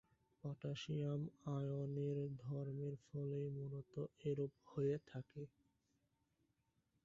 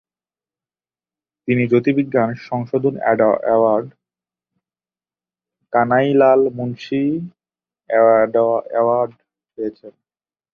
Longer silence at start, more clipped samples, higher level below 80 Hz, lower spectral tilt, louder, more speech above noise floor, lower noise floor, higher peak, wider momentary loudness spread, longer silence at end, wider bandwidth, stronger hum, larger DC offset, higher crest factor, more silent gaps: second, 0.45 s vs 1.45 s; neither; second, -76 dBFS vs -62 dBFS; about the same, -8 dB/octave vs -9 dB/octave; second, -46 LUFS vs -17 LUFS; second, 39 dB vs over 74 dB; second, -84 dBFS vs under -90 dBFS; second, -30 dBFS vs -2 dBFS; second, 9 LU vs 14 LU; first, 1.55 s vs 0.65 s; first, 7.4 kHz vs 6.6 kHz; neither; neither; about the same, 16 dB vs 16 dB; neither